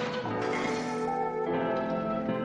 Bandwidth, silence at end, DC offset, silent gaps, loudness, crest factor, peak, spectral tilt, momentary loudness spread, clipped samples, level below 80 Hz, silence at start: 10.5 kHz; 0 s; under 0.1%; none; -31 LUFS; 12 dB; -18 dBFS; -6 dB/octave; 2 LU; under 0.1%; -60 dBFS; 0 s